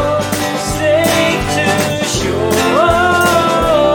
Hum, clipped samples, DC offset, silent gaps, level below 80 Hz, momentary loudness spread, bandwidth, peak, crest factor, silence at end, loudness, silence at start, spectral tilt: none; under 0.1%; under 0.1%; none; -32 dBFS; 5 LU; 18 kHz; 0 dBFS; 12 dB; 0 s; -13 LUFS; 0 s; -4 dB/octave